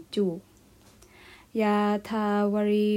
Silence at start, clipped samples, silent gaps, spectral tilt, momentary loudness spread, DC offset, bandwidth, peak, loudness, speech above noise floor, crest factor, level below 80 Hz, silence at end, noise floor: 0 s; under 0.1%; none; -7 dB/octave; 8 LU; under 0.1%; 14 kHz; -14 dBFS; -26 LUFS; 31 dB; 14 dB; -64 dBFS; 0 s; -56 dBFS